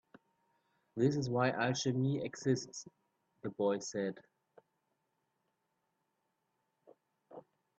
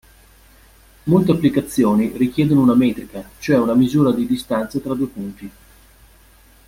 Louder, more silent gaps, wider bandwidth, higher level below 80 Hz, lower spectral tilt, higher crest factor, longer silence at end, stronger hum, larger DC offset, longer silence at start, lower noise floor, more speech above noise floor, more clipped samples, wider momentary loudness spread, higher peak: second, -36 LUFS vs -17 LUFS; neither; second, 8.2 kHz vs 16.5 kHz; second, -78 dBFS vs -48 dBFS; second, -5.5 dB/octave vs -7.5 dB/octave; about the same, 20 dB vs 16 dB; second, 0.4 s vs 1.2 s; neither; neither; about the same, 0.95 s vs 1.05 s; first, -83 dBFS vs -49 dBFS; first, 49 dB vs 32 dB; neither; first, 24 LU vs 15 LU; second, -18 dBFS vs -2 dBFS